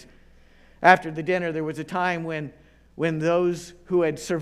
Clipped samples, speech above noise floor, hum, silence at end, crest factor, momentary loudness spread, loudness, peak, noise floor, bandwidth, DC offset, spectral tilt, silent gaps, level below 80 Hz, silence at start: under 0.1%; 29 dB; none; 0 s; 24 dB; 13 LU; -24 LUFS; 0 dBFS; -53 dBFS; 14 kHz; under 0.1%; -6 dB/octave; none; -56 dBFS; 0.8 s